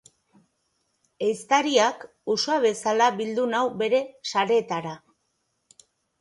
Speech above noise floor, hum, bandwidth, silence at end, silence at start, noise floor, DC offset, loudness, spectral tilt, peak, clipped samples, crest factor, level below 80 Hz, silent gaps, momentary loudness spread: 51 dB; none; 11.5 kHz; 1.25 s; 1.2 s; -74 dBFS; under 0.1%; -24 LUFS; -3 dB/octave; -6 dBFS; under 0.1%; 18 dB; -74 dBFS; none; 10 LU